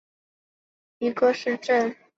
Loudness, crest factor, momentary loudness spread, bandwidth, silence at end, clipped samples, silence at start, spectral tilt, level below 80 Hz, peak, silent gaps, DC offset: -24 LUFS; 18 dB; 7 LU; 7.8 kHz; 0.25 s; under 0.1%; 1 s; -4.5 dB/octave; -74 dBFS; -8 dBFS; none; under 0.1%